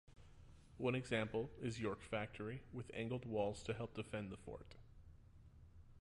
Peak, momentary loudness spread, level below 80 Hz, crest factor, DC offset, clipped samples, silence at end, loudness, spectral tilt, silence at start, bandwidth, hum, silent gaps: -28 dBFS; 24 LU; -64 dBFS; 18 dB; under 0.1%; under 0.1%; 0 s; -45 LUFS; -6 dB/octave; 0.1 s; 11.5 kHz; none; none